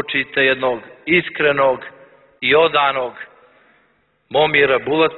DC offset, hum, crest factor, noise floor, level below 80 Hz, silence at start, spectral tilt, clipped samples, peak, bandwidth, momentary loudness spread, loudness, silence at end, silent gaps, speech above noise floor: under 0.1%; none; 16 dB; -61 dBFS; -56 dBFS; 0 s; -8.5 dB/octave; under 0.1%; -2 dBFS; 4.3 kHz; 13 LU; -16 LUFS; 0 s; none; 44 dB